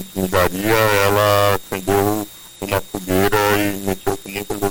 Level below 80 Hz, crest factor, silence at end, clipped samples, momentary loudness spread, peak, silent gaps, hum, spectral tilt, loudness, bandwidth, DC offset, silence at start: -40 dBFS; 14 dB; 0 s; under 0.1%; 10 LU; -4 dBFS; none; none; -4.5 dB/octave; -18 LUFS; 17 kHz; under 0.1%; 0 s